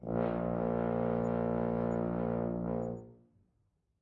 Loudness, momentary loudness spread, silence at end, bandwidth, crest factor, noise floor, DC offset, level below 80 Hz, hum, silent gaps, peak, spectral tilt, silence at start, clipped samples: -34 LUFS; 4 LU; 0.85 s; 7.2 kHz; 16 dB; -77 dBFS; under 0.1%; -54 dBFS; none; none; -18 dBFS; -10.5 dB/octave; 0 s; under 0.1%